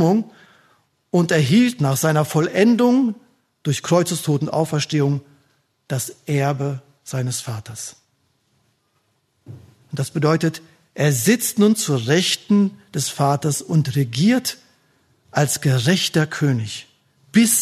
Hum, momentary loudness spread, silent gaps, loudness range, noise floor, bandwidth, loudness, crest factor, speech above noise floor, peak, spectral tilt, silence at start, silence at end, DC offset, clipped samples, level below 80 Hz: none; 14 LU; none; 8 LU; -66 dBFS; 13.5 kHz; -19 LUFS; 18 dB; 48 dB; -2 dBFS; -5 dB/octave; 0 s; 0 s; under 0.1%; under 0.1%; -62 dBFS